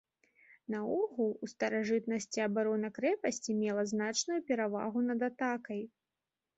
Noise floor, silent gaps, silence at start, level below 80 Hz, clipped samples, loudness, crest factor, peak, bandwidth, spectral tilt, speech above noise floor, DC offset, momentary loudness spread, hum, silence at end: under -90 dBFS; none; 0.7 s; -78 dBFS; under 0.1%; -35 LUFS; 16 dB; -18 dBFS; 8 kHz; -4 dB/octave; over 56 dB; under 0.1%; 6 LU; none; 0.7 s